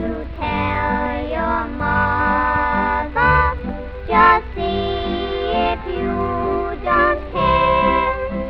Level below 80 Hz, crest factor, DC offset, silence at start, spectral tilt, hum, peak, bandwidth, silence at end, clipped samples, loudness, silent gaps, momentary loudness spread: -30 dBFS; 16 dB; under 0.1%; 0 s; -8.5 dB/octave; none; -2 dBFS; 6 kHz; 0 s; under 0.1%; -18 LUFS; none; 8 LU